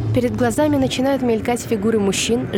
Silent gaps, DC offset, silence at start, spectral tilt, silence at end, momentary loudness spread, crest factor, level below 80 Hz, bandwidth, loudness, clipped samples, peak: none; under 0.1%; 0 s; -5 dB/octave; 0 s; 3 LU; 12 dB; -42 dBFS; 17.5 kHz; -18 LUFS; under 0.1%; -6 dBFS